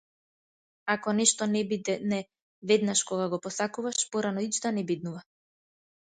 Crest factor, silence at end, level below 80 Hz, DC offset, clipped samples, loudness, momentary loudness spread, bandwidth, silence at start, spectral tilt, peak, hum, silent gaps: 22 dB; 0.9 s; -74 dBFS; under 0.1%; under 0.1%; -28 LUFS; 10 LU; 9.6 kHz; 0.85 s; -3.5 dB/octave; -8 dBFS; none; 2.42-2.62 s